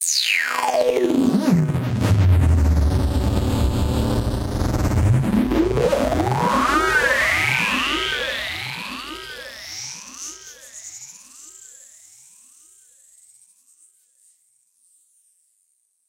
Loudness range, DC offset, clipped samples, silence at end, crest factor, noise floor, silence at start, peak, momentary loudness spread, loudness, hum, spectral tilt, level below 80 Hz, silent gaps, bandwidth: 18 LU; under 0.1%; under 0.1%; 4.45 s; 16 dB; -67 dBFS; 0 s; -4 dBFS; 19 LU; -19 LUFS; none; -5 dB/octave; -30 dBFS; none; 17 kHz